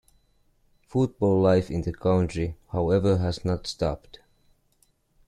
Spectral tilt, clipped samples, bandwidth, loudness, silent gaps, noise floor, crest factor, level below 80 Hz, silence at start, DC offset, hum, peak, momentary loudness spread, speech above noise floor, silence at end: -7.5 dB/octave; under 0.1%; 11 kHz; -25 LUFS; none; -66 dBFS; 16 dB; -46 dBFS; 0.95 s; under 0.1%; none; -10 dBFS; 9 LU; 42 dB; 1.3 s